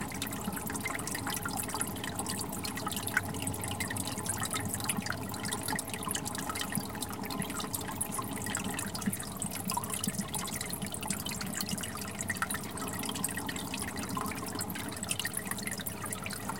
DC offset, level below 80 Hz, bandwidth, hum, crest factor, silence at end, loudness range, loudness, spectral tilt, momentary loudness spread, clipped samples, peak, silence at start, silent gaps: 0.2%; -56 dBFS; 17 kHz; none; 24 dB; 0 s; 1 LU; -35 LUFS; -3 dB/octave; 3 LU; under 0.1%; -12 dBFS; 0 s; none